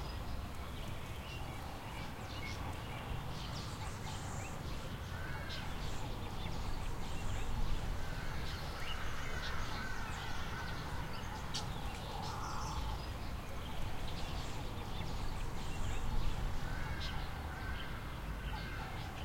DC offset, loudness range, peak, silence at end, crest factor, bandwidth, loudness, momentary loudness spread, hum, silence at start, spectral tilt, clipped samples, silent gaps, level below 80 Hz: under 0.1%; 2 LU; -22 dBFS; 0 s; 16 dB; 16.5 kHz; -43 LUFS; 4 LU; none; 0 s; -4.5 dB/octave; under 0.1%; none; -44 dBFS